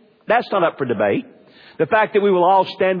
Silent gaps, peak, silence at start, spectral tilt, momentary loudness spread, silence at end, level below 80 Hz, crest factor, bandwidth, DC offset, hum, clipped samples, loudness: none; -4 dBFS; 0.3 s; -8.5 dB/octave; 5 LU; 0 s; -64 dBFS; 14 dB; 5.2 kHz; under 0.1%; none; under 0.1%; -18 LUFS